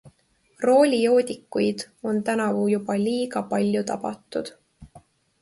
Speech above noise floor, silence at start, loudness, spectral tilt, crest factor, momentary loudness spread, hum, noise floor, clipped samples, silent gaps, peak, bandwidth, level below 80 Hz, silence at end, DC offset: 41 dB; 0.05 s; -23 LUFS; -5.5 dB/octave; 18 dB; 13 LU; none; -63 dBFS; under 0.1%; none; -6 dBFS; 11.5 kHz; -62 dBFS; 0.45 s; under 0.1%